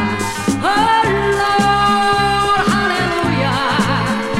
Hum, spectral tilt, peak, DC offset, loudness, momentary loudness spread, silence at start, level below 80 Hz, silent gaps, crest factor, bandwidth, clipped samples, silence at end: none; -4.5 dB/octave; -2 dBFS; under 0.1%; -15 LUFS; 4 LU; 0 s; -36 dBFS; none; 12 dB; 16 kHz; under 0.1%; 0 s